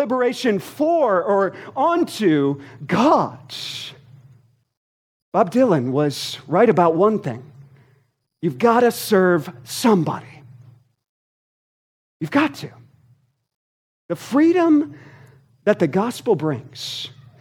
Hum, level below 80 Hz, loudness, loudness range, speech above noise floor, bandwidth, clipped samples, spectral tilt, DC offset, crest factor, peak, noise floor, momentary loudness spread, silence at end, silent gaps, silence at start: none; -70 dBFS; -19 LUFS; 7 LU; 43 dB; 17.5 kHz; under 0.1%; -6 dB/octave; under 0.1%; 20 dB; -2 dBFS; -62 dBFS; 15 LU; 0.35 s; 4.77-5.32 s, 11.09-12.20 s, 13.54-14.09 s; 0 s